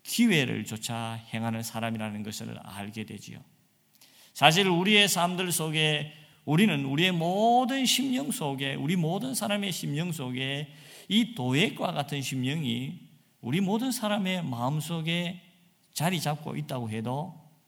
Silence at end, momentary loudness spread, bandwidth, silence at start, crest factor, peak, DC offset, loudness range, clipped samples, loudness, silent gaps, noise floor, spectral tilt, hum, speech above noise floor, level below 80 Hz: 0.25 s; 16 LU; 18 kHz; 0.05 s; 26 dB; -2 dBFS; under 0.1%; 7 LU; under 0.1%; -27 LUFS; none; -61 dBFS; -4 dB/octave; none; 33 dB; -72 dBFS